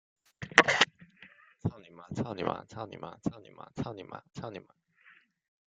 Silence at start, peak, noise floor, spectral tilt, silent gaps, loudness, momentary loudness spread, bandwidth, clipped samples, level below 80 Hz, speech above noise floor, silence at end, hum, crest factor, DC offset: 0.4 s; -4 dBFS; -62 dBFS; -3.5 dB/octave; none; -30 LUFS; 23 LU; 9.4 kHz; under 0.1%; -66 dBFS; 24 dB; 1.1 s; none; 30 dB; under 0.1%